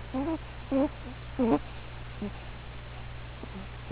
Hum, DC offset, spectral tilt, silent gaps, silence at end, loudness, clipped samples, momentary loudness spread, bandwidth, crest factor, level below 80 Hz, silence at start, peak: 60 Hz at -45 dBFS; under 0.1%; -6 dB/octave; none; 0 s; -34 LUFS; under 0.1%; 15 LU; 4 kHz; 20 dB; -44 dBFS; 0 s; -14 dBFS